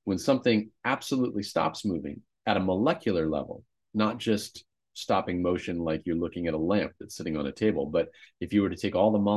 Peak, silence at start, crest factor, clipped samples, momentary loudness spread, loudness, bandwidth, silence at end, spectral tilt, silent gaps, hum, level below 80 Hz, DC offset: -8 dBFS; 0.05 s; 20 dB; under 0.1%; 11 LU; -28 LUFS; 12.5 kHz; 0 s; -6 dB/octave; none; none; -52 dBFS; under 0.1%